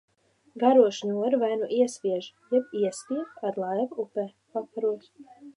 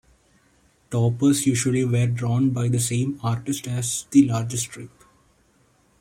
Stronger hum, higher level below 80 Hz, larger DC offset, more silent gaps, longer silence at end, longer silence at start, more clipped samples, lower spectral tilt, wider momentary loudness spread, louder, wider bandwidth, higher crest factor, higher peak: neither; second, -82 dBFS vs -56 dBFS; neither; neither; second, 0.05 s vs 1.15 s; second, 0.55 s vs 0.9 s; neither; about the same, -5.5 dB/octave vs -5.5 dB/octave; first, 13 LU vs 9 LU; second, -27 LUFS vs -22 LUFS; second, 11.5 kHz vs 16.5 kHz; about the same, 20 dB vs 18 dB; second, -8 dBFS vs -4 dBFS